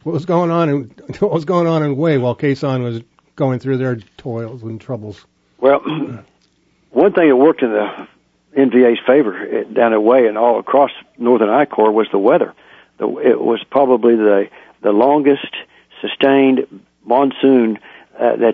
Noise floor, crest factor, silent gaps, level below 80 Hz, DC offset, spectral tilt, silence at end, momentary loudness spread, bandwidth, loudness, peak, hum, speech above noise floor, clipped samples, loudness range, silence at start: -58 dBFS; 14 dB; none; -62 dBFS; under 0.1%; -8.5 dB/octave; 0 s; 15 LU; 7.4 kHz; -15 LUFS; 0 dBFS; none; 44 dB; under 0.1%; 6 LU; 0.05 s